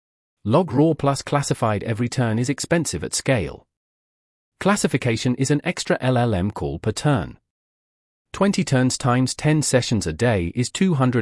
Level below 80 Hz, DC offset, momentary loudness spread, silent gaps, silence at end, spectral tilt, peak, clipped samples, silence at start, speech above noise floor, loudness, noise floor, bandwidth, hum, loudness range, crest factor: -48 dBFS; under 0.1%; 6 LU; 3.77-4.52 s, 7.50-8.25 s; 0 s; -5.5 dB/octave; -4 dBFS; under 0.1%; 0.45 s; over 70 dB; -21 LUFS; under -90 dBFS; 12 kHz; none; 2 LU; 16 dB